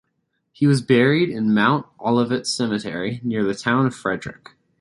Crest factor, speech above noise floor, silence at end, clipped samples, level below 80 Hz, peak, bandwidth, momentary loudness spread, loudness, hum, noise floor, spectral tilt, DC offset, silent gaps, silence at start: 18 dB; 53 dB; 0.5 s; under 0.1%; -58 dBFS; -4 dBFS; 11.5 kHz; 10 LU; -20 LUFS; none; -72 dBFS; -6 dB/octave; under 0.1%; none; 0.6 s